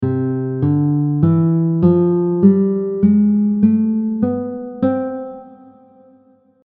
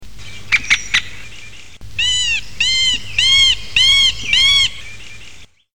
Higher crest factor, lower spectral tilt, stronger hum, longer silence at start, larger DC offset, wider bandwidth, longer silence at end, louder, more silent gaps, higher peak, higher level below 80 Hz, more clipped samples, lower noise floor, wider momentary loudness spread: about the same, 16 dB vs 16 dB; first, -12.5 dB/octave vs 1 dB/octave; neither; about the same, 0 s vs 0 s; second, under 0.1% vs 4%; second, 3.3 kHz vs 18.5 kHz; first, 1.1 s vs 0 s; second, -16 LUFS vs -12 LUFS; neither; about the same, 0 dBFS vs 0 dBFS; second, -54 dBFS vs -38 dBFS; neither; first, -52 dBFS vs -39 dBFS; second, 10 LU vs 16 LU